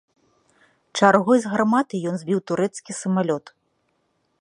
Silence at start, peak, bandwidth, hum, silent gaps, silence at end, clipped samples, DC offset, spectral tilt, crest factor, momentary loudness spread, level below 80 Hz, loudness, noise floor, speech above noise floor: 0.95 s; 0 dBFS; 11 kHz; none; none; 1 s; under 0.1%; under 0.1%; -5.5 dB/octave; 22 dB; 11 LU; -70 dBFS; -21 LUFS; -70 dBFS; 49 dB